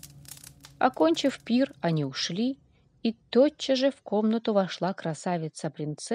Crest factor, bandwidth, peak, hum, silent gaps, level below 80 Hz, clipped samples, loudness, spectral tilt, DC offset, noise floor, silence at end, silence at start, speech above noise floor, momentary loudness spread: 20 dB; 15 kHz; -8 dBFS; none; none; -68 dBFS; under 0.1%; -27 LUFS; -5.5 dB/octave; under 0.1%; -48 dBFS; 0 s; 0.05 s; 22 dB; 11 LU